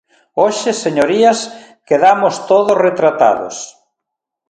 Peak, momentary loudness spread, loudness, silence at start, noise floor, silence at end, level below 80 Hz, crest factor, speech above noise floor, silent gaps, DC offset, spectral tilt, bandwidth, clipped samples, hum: 0 dBFS; 14 LU; -13 LUFS; 0.35 s; -80 dBFS; 0.8 s; -60 dBFS; 14 dB; 67 dB; none; under 0.1%; -4 dB/octave; 11 kHz; under 0.1%; none